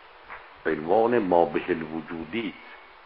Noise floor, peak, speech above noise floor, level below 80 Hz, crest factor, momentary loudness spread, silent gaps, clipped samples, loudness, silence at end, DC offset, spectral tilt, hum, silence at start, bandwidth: -45 dBFS; -6 dBFS; 20 dB; -58 dBFS; 22 dB; 22 LU; none; under 0.1%; -26 LUFS; 0.2 s; under 0.1%; -4.5 dB/octave; none; 0.15 s; 5.4 kHz